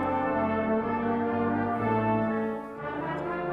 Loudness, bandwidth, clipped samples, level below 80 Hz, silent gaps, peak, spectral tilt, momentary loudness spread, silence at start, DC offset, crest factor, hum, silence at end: -28 LUFS; 5.2 kHz; under 0.1%; -56 dBFS; none; -14 dBFS; -9 dB/octave; 7 LU; 0 s; under 0.1%; 14 dB; none; 0 s